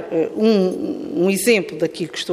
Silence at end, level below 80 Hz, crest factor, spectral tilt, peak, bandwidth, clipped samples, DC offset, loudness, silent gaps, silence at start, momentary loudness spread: 0 s; -62 dBFS; 16 dB; -4.5 dB/octave; -4 dBFS; 15.5 kHz; under 0.1%; under 0.1%; -19 LUFS; none; 0 s; 8 LU